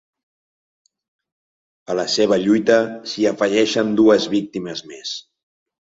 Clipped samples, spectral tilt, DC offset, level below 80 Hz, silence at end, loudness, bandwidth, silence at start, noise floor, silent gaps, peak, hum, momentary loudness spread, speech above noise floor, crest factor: under 0.1%; -4.5 dB/octave; under 0.1%; -62 dBFS; 0.75 s; -18 LUFS; 7.8 kHz; 1.9 s; under -90 dBFS; none; -2 dBFS; none; 14 LU; over 72 dB; 18 dB